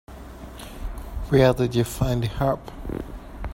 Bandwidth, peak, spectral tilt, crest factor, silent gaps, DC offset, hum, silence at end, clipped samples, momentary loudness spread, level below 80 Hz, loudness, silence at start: 16.5 kHz; -4 dBFS; -6.5 dB/octave; 22 dB; none; under 0.1%; none; 0 s; under 0.1%; 21 LU; -36 dBFS; -23 LUFS; 0.1 s